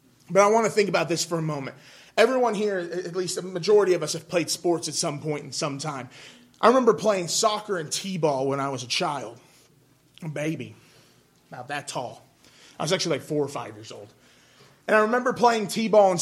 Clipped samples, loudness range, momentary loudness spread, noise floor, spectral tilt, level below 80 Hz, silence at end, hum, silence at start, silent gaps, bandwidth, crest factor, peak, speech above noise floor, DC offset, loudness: under 0.1%; 9 LU; 17 LU; -60 dBFS; -4 dB/octave; -72 dBFS; 0 s; none; 0.3 s; none; 15.5 kHz; 22 dB; -4 dBFS; 36 dB; under 0.1%; -24 LUFS